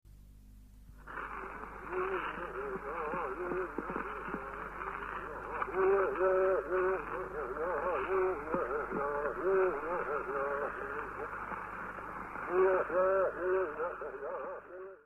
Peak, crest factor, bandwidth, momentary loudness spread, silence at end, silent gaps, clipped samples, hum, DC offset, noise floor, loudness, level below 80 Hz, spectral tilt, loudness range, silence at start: -18 dBFS; 18 dB; 3.8 kHz; 12 LU; 0.05 s; none; under 0.1%; none; under 0.1%; -55 dBFS; -35 LUFS; -56 dBFS; -7.5 dB/octave; 6 LU; 0.05 s